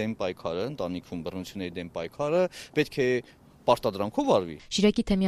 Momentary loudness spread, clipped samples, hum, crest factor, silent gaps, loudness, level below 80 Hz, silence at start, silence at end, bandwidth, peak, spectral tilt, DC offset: 11 LU; under 0.1%; none; 22 dB; none; -28 LUFS; -52 dBFS; 0 s; 0 s; 13.5 kHz; -6 dBFS; -5.5 dB/octave; under 0.1%